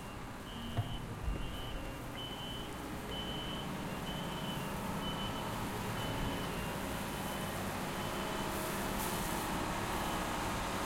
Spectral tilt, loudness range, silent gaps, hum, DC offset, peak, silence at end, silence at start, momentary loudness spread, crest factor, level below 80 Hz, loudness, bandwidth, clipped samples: -4 dB/octave; 4 LU; none; none; under 0.1%; -24 dBFS; 0 s; 0 s; 6 LU; 16 dB; -48 dBFS; -39 LUFS; 16.5 kHz; under 0.1%